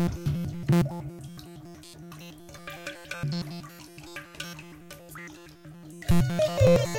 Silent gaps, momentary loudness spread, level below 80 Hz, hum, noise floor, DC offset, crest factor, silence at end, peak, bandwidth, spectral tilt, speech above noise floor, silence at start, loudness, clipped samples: none; 21 LU; -44 dBFS; none; -47 dBFS; under 0.1%; 20 dB; 0 s; -8 dBFS; 17 kHz; -6.5 dB/octave; 22 dB; 0 s; -28 LUFS; under 0.1%